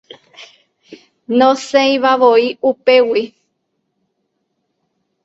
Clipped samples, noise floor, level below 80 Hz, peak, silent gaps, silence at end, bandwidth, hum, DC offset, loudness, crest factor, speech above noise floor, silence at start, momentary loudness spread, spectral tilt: under 0.1%; -70 dBFS; -64 dBFS; 0 dBFS; none; 1.95 s; 8 kHz; none; under 0.1%; -13 LUFS; 16 dB; 57 dB; 0.4 s; 7 LU; -3.5 dB/octave